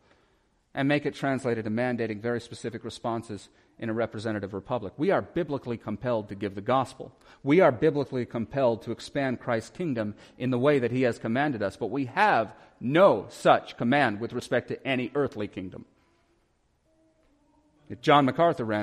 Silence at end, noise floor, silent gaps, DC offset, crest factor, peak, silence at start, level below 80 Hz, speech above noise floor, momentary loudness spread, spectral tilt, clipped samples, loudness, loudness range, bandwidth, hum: 0 s; -69 dBFS; none; under 0.1%; 22 dB; -6 dBFS; 0.75 s; -64 dBFS; 42 dB; 14 LU; -6.5 dB/octave; under 0.1%; -27 LUFS; 7 LU; 12.5 kHz; none